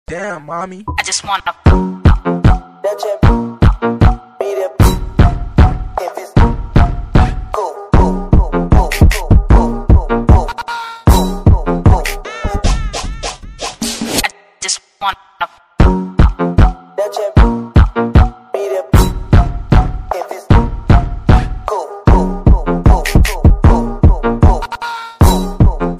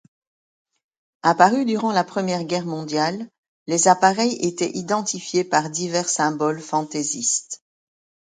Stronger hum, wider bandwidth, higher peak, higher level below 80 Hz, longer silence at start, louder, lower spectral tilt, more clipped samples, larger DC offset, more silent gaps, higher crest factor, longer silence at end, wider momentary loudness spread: neither; first, 15.5 kHz vs 9.6 kHz; about the same, 0 dBFS vs 0 dBFS; first, -14 dBFS vs -68 dBFS; second, 0.1 s vs 1.25 s; first, -14 LUFS vs -21 LUFS; first, -6 dB/octave vs -3.5 dB/octave; first, 0.8% vs under 0.1%; first, 0.5% vs under 0.1%; second, none vs 3.38-3.66 s; second, 12 dB vs 22 dB; second, 0 s vs 0.75 s; about the same, 10 LU vs 9 LU